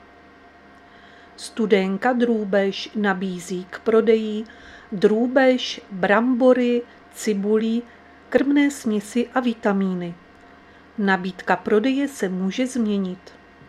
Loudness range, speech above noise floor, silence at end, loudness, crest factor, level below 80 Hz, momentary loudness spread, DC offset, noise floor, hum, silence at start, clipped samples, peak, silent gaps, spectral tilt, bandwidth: 4 LU; 28 dB; 0.4 s; -21 LUFS; 20 dB; -62 dBFS; 13 LU; under 0.1%; -48 dBFS; none; 1.4 s; under 0.1%; -2 dBFS; none; -5.5 dB/octave; 13.5 kHz